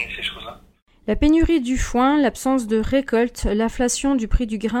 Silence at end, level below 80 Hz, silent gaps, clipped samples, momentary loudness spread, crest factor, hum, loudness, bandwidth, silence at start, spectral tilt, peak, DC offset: 0 s; -30 dBFS; 0.82-0.86 s; under 0.1%; 10 LU; 16 dB; none; -20 LUFS; 16.5 kHz; 0 s; -4.5 dB/octave; -4 dBFS; under 0.1%